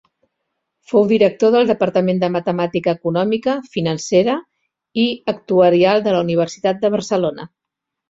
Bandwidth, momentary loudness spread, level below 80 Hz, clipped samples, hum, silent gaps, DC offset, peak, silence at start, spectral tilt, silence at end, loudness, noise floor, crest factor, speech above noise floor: 7.8 kHz; 8 LU; -58 dBFS; under 0.1%; none; none; under 0.1%; -2 dBFS; 0.9 s; -6 dB/octave; 0.65 s; -17 LUFS; -82 dBFS; 16 dB; 65 dB